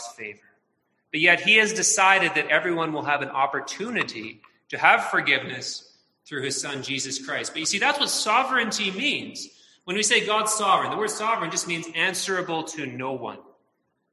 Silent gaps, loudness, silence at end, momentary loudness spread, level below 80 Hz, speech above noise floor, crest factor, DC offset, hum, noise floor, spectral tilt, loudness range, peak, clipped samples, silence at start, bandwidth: none; -22 LUFS; 0.7 s; 17 LU; -72 dBFS; 49 dB; 22 dB; under 0.1%; none; -73 dBFS; -1.5 dB/octave; 5 LU; -2 dBFS; under 0.1%; 0 s; 13 kHz